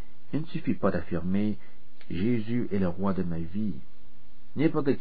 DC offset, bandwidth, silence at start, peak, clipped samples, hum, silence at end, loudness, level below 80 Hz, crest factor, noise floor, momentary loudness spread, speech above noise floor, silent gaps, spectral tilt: 4%; 5 kHz; 0.3 s; -12 dBFS; under 0.1%; none; 0 s; -30 LUFS; -52 dBFS; 18 dB; -58 dBFS; 8 LU; 29 dB; none; -11 dB/octave